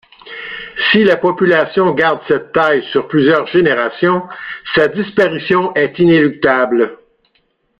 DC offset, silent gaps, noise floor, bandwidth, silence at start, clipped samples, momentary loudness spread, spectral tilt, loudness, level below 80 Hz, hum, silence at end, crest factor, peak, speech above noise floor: under 0.1%; none; -61 dBFS; 6.6 kHz; 0.25 s; under 0.1%; 10 LU; -7.5 dB/octave; -13 LUFS; -52 dBFS; none; 0.85 s; 14 dB; 0 dBFS; 48 dB